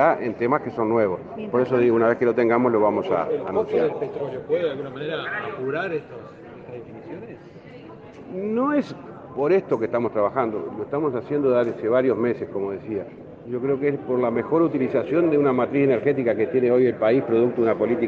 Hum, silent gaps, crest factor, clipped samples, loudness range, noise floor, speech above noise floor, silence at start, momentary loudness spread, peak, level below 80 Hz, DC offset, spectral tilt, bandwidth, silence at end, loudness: none; none; 18 dB; under 0.1%; 9 LU; -42 dBFS; 21 dB; 0 s; 19 LU; -4 dBFS; -62 dBFS; under 0.1%; -9 dB/octave; 6.6 kHz; 0 s; -22 LUFS